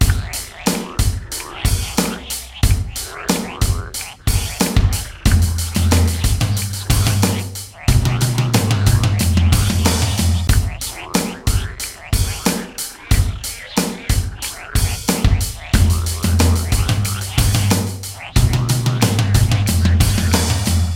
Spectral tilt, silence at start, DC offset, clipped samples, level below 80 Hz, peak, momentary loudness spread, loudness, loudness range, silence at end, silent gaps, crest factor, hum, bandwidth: -4.5 dB/octave; 0 s; under 0.1%; under 0.1%; -22 dBFS; 0 dBFS; 8 LU; -18 LUFS; 4 LU; 0 s; none; 16 dB; none; 17 kHz